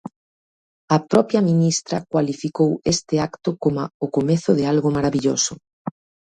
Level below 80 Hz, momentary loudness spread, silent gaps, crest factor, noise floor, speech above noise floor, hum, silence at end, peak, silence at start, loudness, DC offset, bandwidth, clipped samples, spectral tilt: -54 dBFS; 8 LU; 0.16-0.88 s, 3.94-4.00 s, 5.73-5.85 s; 20 dB; under -90 dBFS; over 71 dB; none; 0.4 s; 0 dBFS; 0.05 s; -20 LUFS; under 0.1%; 10.5 kHz; under 0.1%; -5.5 dB/octave